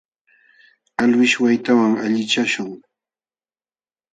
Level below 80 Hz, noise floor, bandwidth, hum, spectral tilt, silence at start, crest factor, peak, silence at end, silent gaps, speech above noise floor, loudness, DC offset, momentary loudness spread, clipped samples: -66 dBFS; under -90 dBFS; 9.2 kHz; none; -4 dB/octave; 1 s; 16 dB; -4 dBFS; 1.35 s; none; over 73 dB; -17 LUFS; under 0.1%; 10 LU; under 0.1%